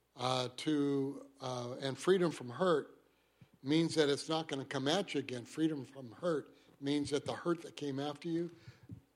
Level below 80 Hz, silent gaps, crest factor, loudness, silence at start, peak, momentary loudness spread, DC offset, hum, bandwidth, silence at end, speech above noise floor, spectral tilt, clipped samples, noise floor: -78 dBFS; none; 20 dB; -36 LUFS; 0.15 s; -18 dBFS; 12 LU; under 0.1%; none; 13 kHz; 0.15 s; 31 dB; -5 dB/octave; under 0.1%; -67 dBFS